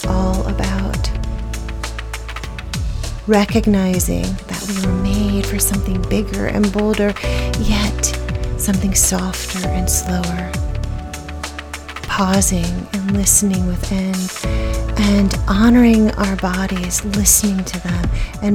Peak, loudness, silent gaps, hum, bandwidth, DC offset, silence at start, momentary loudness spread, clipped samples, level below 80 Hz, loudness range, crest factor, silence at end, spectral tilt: 0 dBFS; -17 LUFS; none; none; 18 kHz; under 0.1%; 0 s; 14 LU; under 0.1%; -24 dBFS; 5 LU; 16 dB; 0 s; -4.5 dB/octave